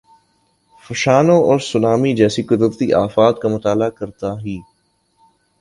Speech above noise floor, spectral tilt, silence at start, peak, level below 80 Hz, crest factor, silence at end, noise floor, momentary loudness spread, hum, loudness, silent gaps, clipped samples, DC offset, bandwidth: 47 dB; -6 dB/octave; 0.9 s; 0 dBFS; -50 dBFS; 16 dB; 1 s; -62 dBFS; 14 LU; none; -16 LUFS; none; under 0.1%; under 0.1%; 11.5 kHz